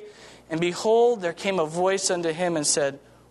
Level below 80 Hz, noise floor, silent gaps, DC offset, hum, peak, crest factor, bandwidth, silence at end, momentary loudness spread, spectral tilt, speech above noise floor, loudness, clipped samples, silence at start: -66 dBFS; -46 dBFS; none; under 0.1%; none; -10 dBFS; 16 dB; 12 kHz; 0.3 s; 7 LU; -3.5 dB/octave; 22 dB; -24 LUFS; under 0.1%; 0 s